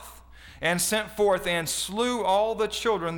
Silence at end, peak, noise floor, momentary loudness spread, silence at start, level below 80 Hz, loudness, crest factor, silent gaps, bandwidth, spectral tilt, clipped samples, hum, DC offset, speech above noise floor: 0 s; -12 dBFS; -48 dBFS; 3 LU; 0 s; -52 dBFS; -25 LUFS; 14 dB; none; over 20 kHz; -3 dB/octave; under 0.1%; none; under 0.1%; 22 dB